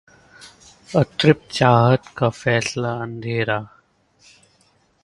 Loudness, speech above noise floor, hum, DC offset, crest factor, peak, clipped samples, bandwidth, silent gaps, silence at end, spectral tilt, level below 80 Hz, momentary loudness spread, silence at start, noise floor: -19 LUFS; 41 dB; none; under 0.1%; 20 dB; 0 dBFS; under 0.1%; 11.5 kHz; none; 1.4 s; -6 dB/octave; -54 dBFS; 10 LU; 0.4 s; -60 dBFS